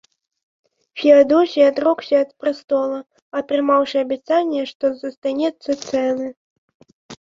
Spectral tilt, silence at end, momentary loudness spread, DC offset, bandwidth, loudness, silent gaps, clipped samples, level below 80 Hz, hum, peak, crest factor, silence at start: -4.5 dB/octave; 0.05 s; 12 LU; under 0.1%; 7.6 kHz; -18 LUFS; 3.22-3.31 s, 4.75-4.80 s, 5.17-5.22 s, 6.37-6.68 s, 6.75-6.80 s, 6.93-7.09 s; under 0.1%; -66 dBFS; none; -2 dBFS; 18 dB; 0.95 s